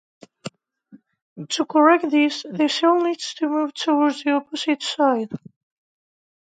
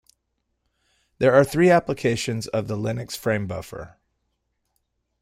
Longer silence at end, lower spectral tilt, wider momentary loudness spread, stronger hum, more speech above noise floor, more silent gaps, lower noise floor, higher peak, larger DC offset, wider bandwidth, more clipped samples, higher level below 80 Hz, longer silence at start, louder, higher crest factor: second, 1.2 s vs 1.35 s; second, -4 dB/octave vs -6 dB/octave; first, 21 LU vs 15 LU; neither; second, 32 dB vs 54 dB; first, 1.22-1.36 s vs none; second, -52 dBFS vs -76 dBFS; about the same, -2 dBFS vs -4 dBFS; neither; second, 9.2 kHz vs 16 kHz; neither; second, -76 dBFS vs -54 dBFS; second, 0.45 s vs 1.2 s; about the same, -20 LUFS vs -22 LUFS; about the same, 20 dB vs 20 dB